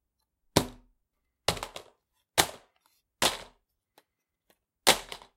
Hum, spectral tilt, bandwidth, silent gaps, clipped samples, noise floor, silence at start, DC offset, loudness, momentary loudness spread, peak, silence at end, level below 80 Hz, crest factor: none; -2 dB/octave; 16.5 kHz; none; under 0.1%; -80 dBFS; 0.55 s; under 0.1%; -28 LUFS; 17 LU; -2 dBFS; 0.2 s; -56 dBFS; 32 dB